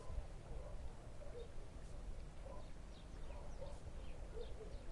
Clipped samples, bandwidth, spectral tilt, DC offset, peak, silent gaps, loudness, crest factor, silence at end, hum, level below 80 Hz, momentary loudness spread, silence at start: under 0.1%; 11.5 kHz; -6 dB/octave; under 0.1%; -32 dBFS; none; -55 LUFS; 16 dB; 0 s; none; -52 dBFS; 4 LU; 0 s